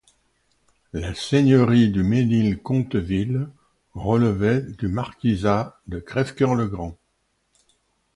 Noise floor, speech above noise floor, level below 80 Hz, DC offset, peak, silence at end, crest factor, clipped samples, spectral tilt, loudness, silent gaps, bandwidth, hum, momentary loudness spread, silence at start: -70 dBFS; 49 dB; -44 dBFS; under 0.1%; -4 dBFS; 1.25 s; 18 dB; under 0.1%; -7.5 dB/octave; -22 LUFS; none; 11.5 kHz; none; 15 LU; 0.95 s